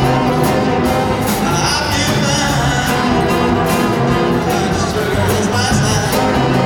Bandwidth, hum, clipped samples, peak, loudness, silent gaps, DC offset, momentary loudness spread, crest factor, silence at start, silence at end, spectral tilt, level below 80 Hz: 19.5 kHz; none; under 0.1%; 0 dBFS; -14 LUFS; none; under 0.1%; 2 LU; 14 dB; 0 s; 0 s; -4.5 dB/octave; -30 dBFS